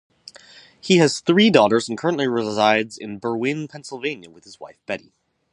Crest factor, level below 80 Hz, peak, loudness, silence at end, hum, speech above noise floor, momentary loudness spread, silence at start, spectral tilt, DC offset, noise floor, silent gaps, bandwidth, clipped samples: 20 dB; -64 dBFS; 0 dBFS; -20 LUFS; 0.55 s; none; 28 dB; 20 LU; 0.85 s; -5 dB/octave; under 0.1%; -48 dBFS; none; 11.5 kHz; under 0.1%